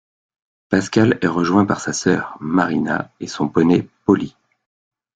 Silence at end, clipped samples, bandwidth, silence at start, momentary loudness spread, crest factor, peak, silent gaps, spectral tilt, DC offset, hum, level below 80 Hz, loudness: 0.9 s; under 0.1%; 9.4 kHz; 0.7 s; 7 LU; 18 dB; -2 dBFS; none; -6 dB/octave; under 0.1%; none; -54 dBFS; -18 LUFS